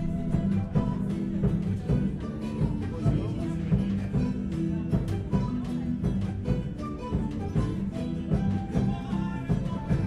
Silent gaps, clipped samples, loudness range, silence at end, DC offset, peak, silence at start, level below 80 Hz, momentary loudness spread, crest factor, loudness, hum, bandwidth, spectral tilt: none; under 0.1%; 1 LU; 0 s; under 0.1%; -12 dBFS; 0 s; -38 dBFS; 4 LU; 16 dB; -29 LUFS; none; 11 kHz; -9 dB/octave